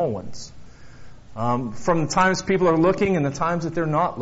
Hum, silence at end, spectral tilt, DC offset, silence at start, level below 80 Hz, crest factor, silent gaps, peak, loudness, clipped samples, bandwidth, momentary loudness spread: none; 0 s; -5.5 dB/octave; under 0.1%; 0 s; -48 dBFS; 20 dB; none; -2 dBFS; -22 LUFS; under 0.1%; 8 kHz; 18 LU